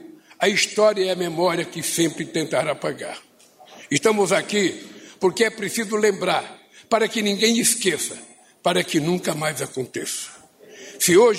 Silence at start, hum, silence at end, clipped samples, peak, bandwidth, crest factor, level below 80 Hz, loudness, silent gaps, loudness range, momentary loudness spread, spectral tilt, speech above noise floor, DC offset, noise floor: 0 s; none; 0 s; under 0.1%; -6 dBFS; 16 kHz; 16 dB; -66 dBFS; -21 LUFS; none; 3 LU; 12 LU; -3 dB/octave; 28 dB; under 0.1%; -49 dBFS